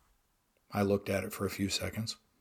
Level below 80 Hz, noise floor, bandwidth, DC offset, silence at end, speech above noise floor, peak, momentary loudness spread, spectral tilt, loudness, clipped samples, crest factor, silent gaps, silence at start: -64 dBFS; -74 dBFS; 19 kHz; under 0.1%; 0.25 s; 41 dB; -16 dBFS; 8 LU; -4.5 dB/octave; -34 LUFS; under 0.1%; 20 dB; none; 0.7 s